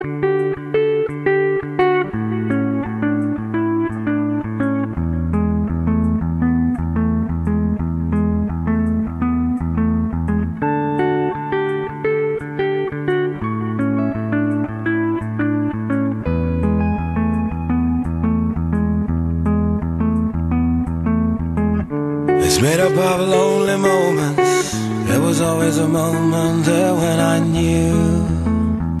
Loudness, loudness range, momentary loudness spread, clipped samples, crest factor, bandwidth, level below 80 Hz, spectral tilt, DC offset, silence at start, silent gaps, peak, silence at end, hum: -18 LUFS; 4 LU; 5 LU; under 0.1%; 16 dB; 13.5 kHz; -32 dBFS; -6.5 dB/octave; under 0.1%; 0 s; none; -2 dBFS; 0 s; none